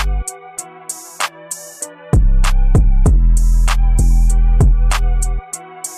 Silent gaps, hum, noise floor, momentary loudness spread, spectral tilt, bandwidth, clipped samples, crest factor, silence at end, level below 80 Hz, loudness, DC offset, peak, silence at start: none; none; -32 dBFS; 14 LU; -5 dB/octave; 13.5 kHz; under 0.1%; 8 dB; 0 s; -12 dBFS; -16 LUFS; under 0.1%; -4 dBFS; 0 s